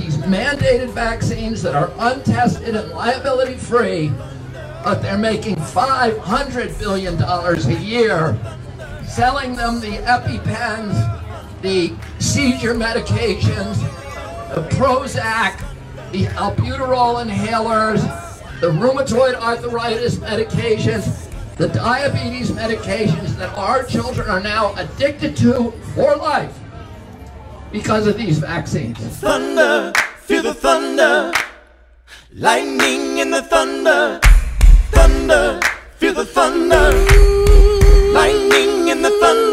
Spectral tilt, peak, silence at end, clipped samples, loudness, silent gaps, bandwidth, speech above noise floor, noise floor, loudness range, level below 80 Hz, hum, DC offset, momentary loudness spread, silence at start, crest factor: -5 dB/octave; 0 dBFS; 0 s; under 0.1%; -17 LUFS; none; 15.5 kHz; 30 dB; -46 dBFS; 6 LU; -22 dBFS; none; under 0.1%; 13 LU; 0 s; 16 dB